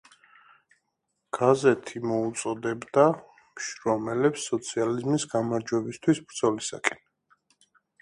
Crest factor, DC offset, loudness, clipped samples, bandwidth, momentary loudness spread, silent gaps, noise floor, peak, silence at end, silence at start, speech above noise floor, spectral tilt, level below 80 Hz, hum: 24 dB; under 0.1%; -27 LUFS; under 0.1%; 11.5 kHz; 9 LU; none; -79 dBFS; -2 dBFS; 1.05 s; 1.35 s; 53 dB; -5 dB/octave; -68 dBFS; none